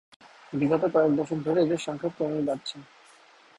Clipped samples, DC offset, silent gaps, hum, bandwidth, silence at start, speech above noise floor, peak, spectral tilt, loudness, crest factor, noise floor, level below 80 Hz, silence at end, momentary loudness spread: under 0.1%; under 0.1%; none; none; 11.5 kHz; 0.5 s; 30 dB; -10 dBFS; -6.5 dB/octave; -27 LUFS; 18 dB; -56 dBFS; -66 dBFS; 0.75 s; 12 LU